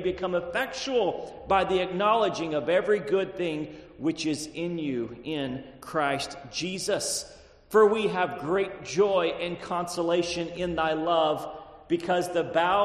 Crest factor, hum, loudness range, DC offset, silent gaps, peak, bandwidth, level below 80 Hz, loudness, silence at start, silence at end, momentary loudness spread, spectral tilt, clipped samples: 18 dB; none; 5 LU; under 0.1%; none; -10 dBFS; 13 kHz; -56 dBFS; -27 LUFS; 0 s; 0 s; 9 LU; -4 dB/octave; under 0.1%